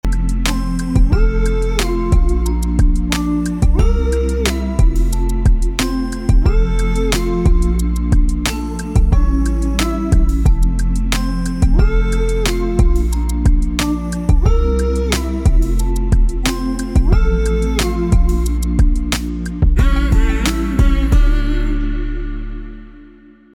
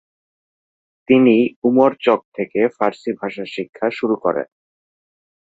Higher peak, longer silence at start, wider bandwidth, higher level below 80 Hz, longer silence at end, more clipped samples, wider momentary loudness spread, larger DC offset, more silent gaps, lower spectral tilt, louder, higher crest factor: about the same, -4 dBFS vs -2 dBFS; second, 0.05 s vs 1.1 s; first, 15.5 kHz vs 7.8 kHz; first, -14 dBFS vs -62 dBFS; second, 0.5 s vs 1.05 s; neither; second, 5 LU vs 12 LU; neither; second, none vs 1.56-1.62 s, 2.25-2.32 s, 3.69-3.73 s; second, -6 dB/octave vs -7.5 dB/octave; about the same, -17 LUFS vs -18 LUFS; second, 10 dB vs 18 dB